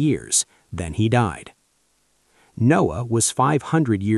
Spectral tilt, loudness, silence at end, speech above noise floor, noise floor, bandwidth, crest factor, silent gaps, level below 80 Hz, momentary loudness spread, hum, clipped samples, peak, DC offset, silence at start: -5 dB/octave; -20 LUFS; 0 s; 46 dB; -65 dBFS; 13 kHz; 16 dB; none; -46 dBFS; 11 LU; none; under 0.1%; -6 dBFS; under 0.1%; 0 s